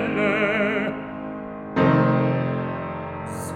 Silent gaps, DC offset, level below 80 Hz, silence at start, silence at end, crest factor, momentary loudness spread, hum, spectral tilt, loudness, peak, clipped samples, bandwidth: none; under 0.1%; -54 dBFS; 0 s; 0 s; 16 dB; 14 LU; none; -7 dB/octave; -23 LUFS; -6 dBFS; under 0.1%; 15.5 kHz